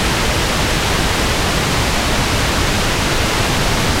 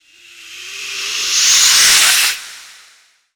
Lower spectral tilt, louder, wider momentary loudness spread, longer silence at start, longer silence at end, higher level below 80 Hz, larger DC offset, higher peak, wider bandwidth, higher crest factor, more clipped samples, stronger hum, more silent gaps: first, -3.5 dB/octave vs 4 dB/octave; second, -15 LUFS vs -9 LUFS; second, 0 LU vs 21 LU; second, 0 s vs 0.4 s; second, 0 s vs 0.7 s; first, -22 dBFS vs -54 dBFS; neither; second, -4 dBFS vs 0 dBFS; second, 16 kHz vs over 20 kHz; about the same, 12 dB vs 16 dB; neither; neither; neither